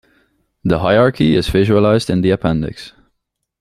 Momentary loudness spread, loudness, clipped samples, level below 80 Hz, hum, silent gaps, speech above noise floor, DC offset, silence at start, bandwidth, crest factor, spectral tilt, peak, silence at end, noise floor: 11 LU; -15 LUFS; under 0.1%; -36 dBFS; none; none; 58 dB; under 0.1%; 0.65 s; 14.5 kHz; 14 dB; -7 dB/octave; -2 dBFS; 0.7 s; -72 dBFS